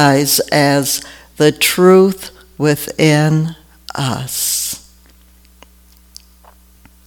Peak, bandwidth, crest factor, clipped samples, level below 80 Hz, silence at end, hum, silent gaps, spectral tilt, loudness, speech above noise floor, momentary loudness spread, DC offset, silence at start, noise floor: 0 dBFS; 19 kHz; 16 dB; under 0.1%; -48 dBFS; 2.3 s; none; none; -4.5 dB/octave; -13 LUFS; 34 dB; 18 LU; under 0.1%; 0 s; -46 dBFS